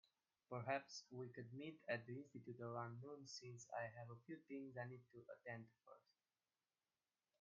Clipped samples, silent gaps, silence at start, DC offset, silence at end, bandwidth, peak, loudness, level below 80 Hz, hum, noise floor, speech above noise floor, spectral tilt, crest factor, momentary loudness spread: under 0.1%; none; 0.5 s; under 0.1%; 1.4 s; 7.2 kHz; -30 dBFS; -53 LUFS; under -90 dBFS; none; under -90 dBFS; over 37 dB; -4.5 dB/octave; 24 dB; 11 LU